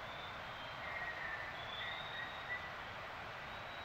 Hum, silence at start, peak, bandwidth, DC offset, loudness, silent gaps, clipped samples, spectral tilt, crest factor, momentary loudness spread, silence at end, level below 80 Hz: none; 0 s; -32 dBFS; 16 kHz; under 0.1%; -44 LUFS; none; under 0.1%; -3.5 dB/octave; 14 dB; 4 LU; 0 s; -66 dBFS